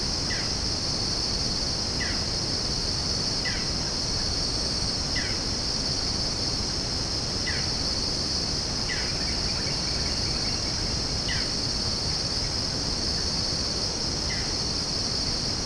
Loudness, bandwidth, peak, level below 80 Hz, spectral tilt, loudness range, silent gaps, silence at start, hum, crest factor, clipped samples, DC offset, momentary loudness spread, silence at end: -25 LUFS; 10.5 kHz; -12 dBFS; -38 dBFS; -2.5 dB/octave; 0 LU; none; 0 s; none; 16 dB; under 0.1%; under 0.1%; 1 LU; 0 s